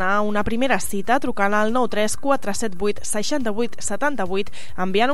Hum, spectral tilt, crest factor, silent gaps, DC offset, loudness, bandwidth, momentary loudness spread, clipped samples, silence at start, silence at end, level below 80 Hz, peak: none; -4 dB/octave; 16 dB; none; 9%; -22 LUFS; 15.5 kHz; 6 LU; under 0.1%; 0 s; 0 s; -46 dBFS; -4 dBFS